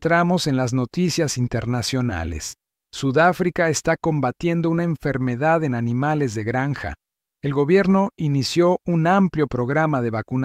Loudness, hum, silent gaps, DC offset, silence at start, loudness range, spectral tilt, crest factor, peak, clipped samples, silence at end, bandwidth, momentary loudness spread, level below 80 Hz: -21 LUFS; none; none; under 0.1%; 0 s; 2 LU; -6 dB/octave; 16 dB; -4 dBFS; under 0.1%; 0 s; 15.5 kHz; 8 LU; -46 dBFS